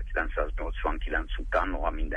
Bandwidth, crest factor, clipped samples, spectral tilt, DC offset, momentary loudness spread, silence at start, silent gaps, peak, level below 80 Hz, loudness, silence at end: 4.2 kHz; 16 dB; under 0.1%; -7 dB/octave; under 0.1%; 4 LU; 0 s; none; -12 dBFS; -32 dBFS; -31 LUFS; 0 s